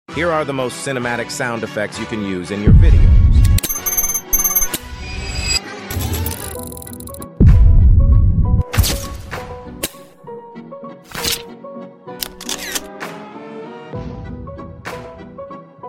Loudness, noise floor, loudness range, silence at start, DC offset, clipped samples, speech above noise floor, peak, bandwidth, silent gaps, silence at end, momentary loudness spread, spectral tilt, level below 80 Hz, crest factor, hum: -17 LUFS; -36 dBFS; 13 LU; 0.1 s; under 0.1%; under 0.1%; 22 dB; 0 dBFS; 17 kHz; none; 0 s; 21 LU; -4.5 dB/octave; -18 dBFS; 16 dB; none